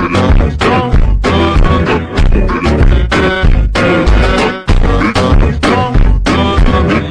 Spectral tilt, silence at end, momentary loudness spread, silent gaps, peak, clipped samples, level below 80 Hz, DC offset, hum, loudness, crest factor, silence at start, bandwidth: -6.5 dB/octave; 0 s; 2 LU; none; 0 dBFS; under 0.1%; -12 dBFS; under 0.1%; none; -11 LUFS; 8 dB; 0 s; 10 kHz